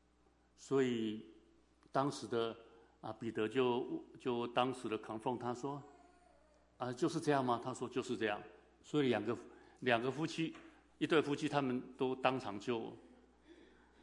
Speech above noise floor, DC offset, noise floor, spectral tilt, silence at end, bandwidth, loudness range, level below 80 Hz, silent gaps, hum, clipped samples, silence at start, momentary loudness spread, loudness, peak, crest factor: 34 dB; under 0.1%; -72 dBFS; -5.5 dB/octave; 0.4 s; 11 kHz; 3 LU; -76 dBFS; none; none; under 0.1%; 0.6 s; 11 LU; -39 LUFS; -16 dBFS; 24 dB